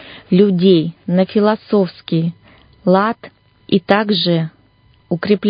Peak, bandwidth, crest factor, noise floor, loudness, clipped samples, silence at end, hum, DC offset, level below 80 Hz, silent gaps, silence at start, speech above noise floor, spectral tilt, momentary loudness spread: 0 dBFS; 5.2 kHz; 16 dB; -52 dBFS; -16 LUFS; under 0.1%; 0 s; none; under 0.1%; -56 dBFS; none; 0 s; 38 dB; -10 dB/octave; 10 LU